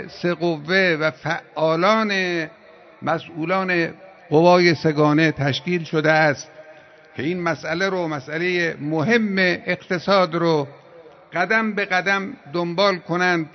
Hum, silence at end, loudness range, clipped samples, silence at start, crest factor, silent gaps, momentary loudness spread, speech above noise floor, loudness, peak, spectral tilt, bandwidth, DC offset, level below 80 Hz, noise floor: none; 0.05 s; 4 LU; under 0.1%; 0 s; 18 dB; none; 10 LU; 26 dB; -20 LUFS; -2 dBFS; -6 dB/octave; 6.4 kHz; under 0.1%; -64 dBFS; -46 dBFS